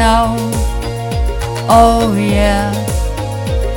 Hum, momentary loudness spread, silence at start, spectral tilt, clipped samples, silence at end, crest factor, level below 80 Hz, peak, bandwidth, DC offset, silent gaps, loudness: none; 10 LU; 0 s; -5.5 dB/octave; 0.2%; 0 s; 12 dB; -20 dBFS; 0 dBFS; 17.5 kHz; under 0.1%; none; -14 LUFS